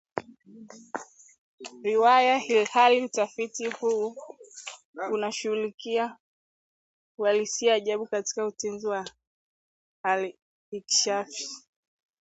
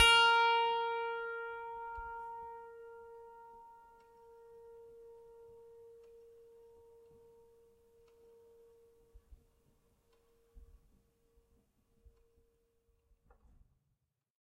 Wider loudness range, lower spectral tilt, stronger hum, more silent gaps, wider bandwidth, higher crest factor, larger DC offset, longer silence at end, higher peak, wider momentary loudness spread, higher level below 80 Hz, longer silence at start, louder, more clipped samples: second, 7 LU vs 26 LU; first, -1.5 dB/octave vs 0 dB/octave; neither; first, 1.38-1.58 s, 4.85-4.93 s, 5.74-5.78 s, 6.20-7.18 s, 9.27-10.04 s, 10.42-10.72 s vs none; second, 8.2 kHz vs 14.5 kHz; about the same, 22 dB vs 26 dB; neither; second, 0.65 s vs 4 s; first, -6 dBFS vs -14 dBFS; second, 20 LU vs 30 LU; second, -80 dBFS vs -66 dBFS; first, 0.15 s vs 0 s; first, -26 LUFS vs -33 LUFS; neither